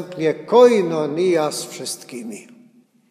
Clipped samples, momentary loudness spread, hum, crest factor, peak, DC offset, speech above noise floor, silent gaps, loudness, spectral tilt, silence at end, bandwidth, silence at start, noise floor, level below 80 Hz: under 0.1%; 20 LU; none; 18 dB; 0 dBFS; under 0.1%; 34 dB; none; -18 LUFS; -4.5 dB/octave; 0.7 s; 14.5 kHz; 0 s; -53 dBFS; -74 dBFS